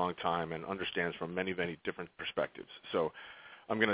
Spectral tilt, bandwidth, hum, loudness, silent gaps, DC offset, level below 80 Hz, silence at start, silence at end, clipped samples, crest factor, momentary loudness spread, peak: -3 dB/octave; 4 kHz; none; -37 LUFS; none; under 0.1%; -66 dBFS; 0 s; 0 s; under 0.1%; 24 dB; 11 LU; -14 dBFS